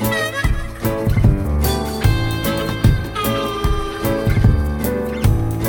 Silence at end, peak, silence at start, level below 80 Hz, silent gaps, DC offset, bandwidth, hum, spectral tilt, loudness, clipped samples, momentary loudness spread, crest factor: 0 s; 0 dBFS; 0 s; -22 dBFS; none; under 0.1%; 19.5 kHz; none; -6 dB/octave; -19 LUFS; under 0.1%; 5 LU; 16 dB